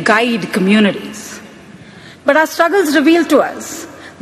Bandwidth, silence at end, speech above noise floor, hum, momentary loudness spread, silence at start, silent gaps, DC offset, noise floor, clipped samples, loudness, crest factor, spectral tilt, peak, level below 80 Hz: 15 kHz; 0.1 s; 25 dB; none; 18 LU; 0 s; none; under 0.1%; -37 dBFS; under 0.1%; -13 LUFS; 14 dB; -4.5 dB/octave; 0 dBFS; -58 dBFS